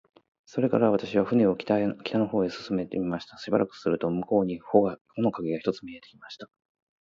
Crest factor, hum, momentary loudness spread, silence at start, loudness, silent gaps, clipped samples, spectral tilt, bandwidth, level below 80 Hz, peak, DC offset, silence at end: 22 dB; none; 14 LU; 0.55 s; -27 LUFS; 5.01-5.05 s; under 0.1%; -8 dB/octave; 7.4 kHz; -62 dBFS; -4 dBFS; under 0.1%; 0.55 s